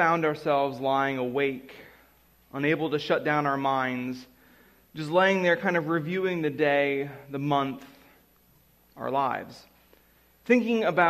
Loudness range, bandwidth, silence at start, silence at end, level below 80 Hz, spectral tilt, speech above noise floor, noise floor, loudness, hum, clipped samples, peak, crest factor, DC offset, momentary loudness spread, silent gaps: 5 LU; 15 kHz; 0 s; 0 s; -68 dBFS; -6.5 dB/octave; 36 dB; -61 dBFS; -26 LUFS; none; under 0.1%; -8 dBFS; 20 dB; under 0.1%; 15 LU; none